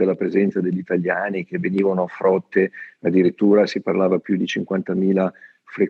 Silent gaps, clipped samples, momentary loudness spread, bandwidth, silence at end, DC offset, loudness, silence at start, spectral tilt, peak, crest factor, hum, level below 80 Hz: none; under 0.1%; 7 LU; 7 kHz; 0 s; under 0.1%; -20 LUFS; 0 s; -7.5 dB/octave; -4 dBFS; 16 dB; none; -72 dBFS